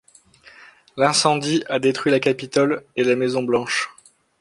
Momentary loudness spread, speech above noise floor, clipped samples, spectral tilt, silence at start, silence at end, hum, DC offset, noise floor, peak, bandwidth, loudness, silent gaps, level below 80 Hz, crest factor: 6 LU; 31 dB; under 0.1%; -4 dB/octave; 0.95 s; 0.55 s; none; under 0.1%; -50 dBFS; -2 dBFS; 11.5 kHz; -20 LUFS; none; -64 dBFS; 20 dB